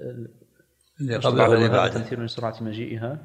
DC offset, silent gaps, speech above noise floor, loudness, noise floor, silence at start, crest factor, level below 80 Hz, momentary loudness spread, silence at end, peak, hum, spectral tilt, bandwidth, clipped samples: under 0.1%; none; 40 dB; -23 LUFS; -63 dBFS; 0 s; 20 dB; -62 dBFS; 18 LU; 0 s; -4 dBFS; none; -6.5 dB/octave; 9.6 kHz; under 0.1%